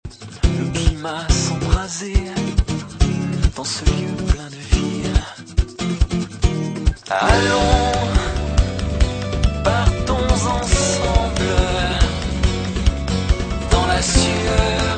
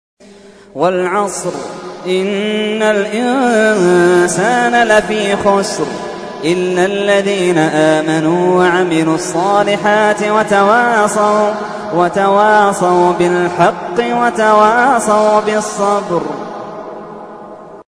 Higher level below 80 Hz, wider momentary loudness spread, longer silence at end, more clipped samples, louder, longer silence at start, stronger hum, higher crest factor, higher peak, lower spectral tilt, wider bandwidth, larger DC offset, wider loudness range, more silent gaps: first, -22 dBFS vs -52 dBFS; second, 6 LU vs 14 LU; about the same, 0 s vs 0.05 s; neither; second, -19 LUFS vs -12 LUFS; second, 0.05 s vs 0.75 s; neither; first, 18 dB vs 12 dB; about the same, 0 dBFS vs 0 dBFS; about the same, -4.5 dB/octave vs -4.5 dB/octave; second, 9.2 kHz vs 11 kHz; neither; about the same, 3 LU vs 2 LU; neither